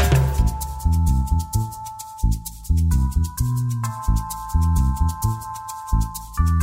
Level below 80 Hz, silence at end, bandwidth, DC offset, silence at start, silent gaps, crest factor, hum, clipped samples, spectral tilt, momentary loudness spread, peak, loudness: -24 dBFS; 0 s; 16.5 kHz; under 0.1%; 0 s; none; 16 dB; none; under 0.1%; -6 dB/octave; 9 LU; -6 dBFS; -23 LUFS